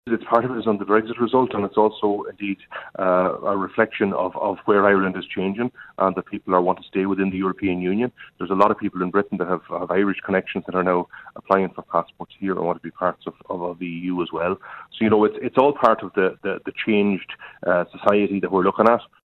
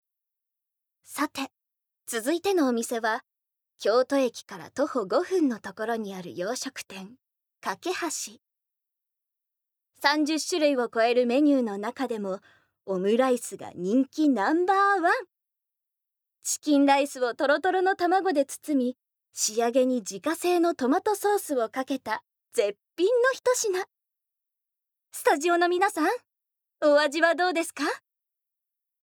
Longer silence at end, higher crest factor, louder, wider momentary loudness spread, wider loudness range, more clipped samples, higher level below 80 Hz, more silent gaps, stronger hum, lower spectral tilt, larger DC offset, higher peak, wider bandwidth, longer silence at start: second, 0.2 s vs 1.05 s; about the same, 20 dB vs 22 dB; first, -22 LUFS vs -26 LUFS; about the same, 11 LU vs 12 LU; about the same, 4 LU vs 5 LU; neither; first, -56 dBFS vs -82 dBFS; neither; neither; first, -8.5 dB/octave vs -3 dB/octave; neither; first, -2 dBFS vs -6 dBFS; second, 5.6 kHz vs over 20 kHz; second, 0.05 s vs 1.1 s